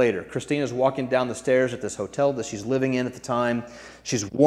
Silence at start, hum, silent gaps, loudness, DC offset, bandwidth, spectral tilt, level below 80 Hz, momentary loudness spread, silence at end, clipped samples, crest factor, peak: 0 s; none; none; -25 LUFS; under 0.1%; 13 kHz; -5 dB/octave; -58 dBFS; 8 LU; 0 s; under 0.1%; 20 dB; -4 dBFS